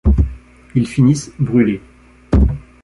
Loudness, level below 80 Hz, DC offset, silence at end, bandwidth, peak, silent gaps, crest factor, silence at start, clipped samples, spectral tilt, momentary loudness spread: -17 LUFS; -20 dBFS; under 0.1%; 0.2 s; 11.5 kHz; -2 dBFS; none; 14 dB; 0.05 s; under 0.1%; -7.5 dB/octave; 7 LU